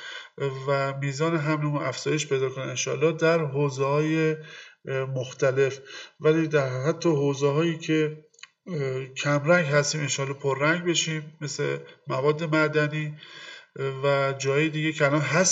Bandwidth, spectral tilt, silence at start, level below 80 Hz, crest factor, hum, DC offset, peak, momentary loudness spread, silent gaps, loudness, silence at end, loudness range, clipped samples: 8 kHz; -4.5 dB/octave; 0 s; -74 dBFS; 18 dB; none; under 0.1%; -6 dBFS; 12 LU; none; -25 LUFS; 0 s; 1 LU; under 0.1%